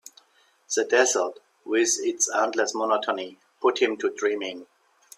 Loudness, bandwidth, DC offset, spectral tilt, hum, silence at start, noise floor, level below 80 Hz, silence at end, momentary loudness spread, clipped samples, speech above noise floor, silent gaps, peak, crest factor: -24 LUFS; 15 kHz; under 0.1%; -0.5 dB/octave; none; 0.7 s; -63 dBFS; -78 dBFS; 0.55 s; 11 LU; under 0.1%; 38 dB; none; -6 dBFS; 20 dB